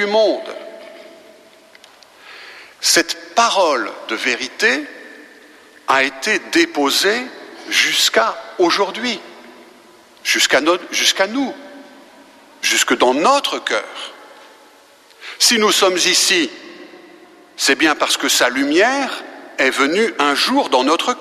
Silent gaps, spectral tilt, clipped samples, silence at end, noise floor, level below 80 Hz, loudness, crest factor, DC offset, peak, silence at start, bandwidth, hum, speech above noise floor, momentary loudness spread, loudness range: none; -0.5 dB/octave; under 0.1%; 0 s; -47 dBFS; -64 dBFS; -15 LUFS; 18 dB; under 0.1%; -2 dBFS; 0 s; 16 kHz; none; 31 dB; 19 LU; 3 LU